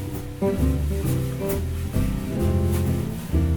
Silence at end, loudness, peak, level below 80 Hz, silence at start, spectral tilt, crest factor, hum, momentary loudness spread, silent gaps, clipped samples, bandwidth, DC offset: 0 s; -25 LUFS; -10 dBFS; -30 dBFS; 0 s; -7.5 dB/octave; 14 dB; none; 4 LU; none; under 0.1%; over 20 kHz; under 0.1%